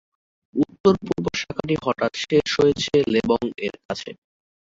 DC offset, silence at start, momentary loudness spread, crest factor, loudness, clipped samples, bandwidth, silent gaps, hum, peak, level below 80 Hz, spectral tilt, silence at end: under 0.1%; 0.55 s; 12 LU; 20 dB; -22 LUFS; under 0.1%; 7.8 kHz; 0.80-0.84 s, 3.85-3.89 s; none; -4 dBFS; -52 dBFS; -5.5 dB/octave; 0.55 s